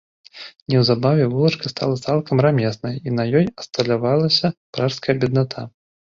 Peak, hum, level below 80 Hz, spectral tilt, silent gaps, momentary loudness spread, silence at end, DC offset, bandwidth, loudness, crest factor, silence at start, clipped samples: -2 dBFS; none; -54 dBFS; -6.5 dB/octave; 0.62-0.66 s, 4.57-4.73 s; 10 LU; 0.35 s; under 0.1%; 7.6 kHz; -19 LUFS; 18 dB; 0.35 s; under 0.1%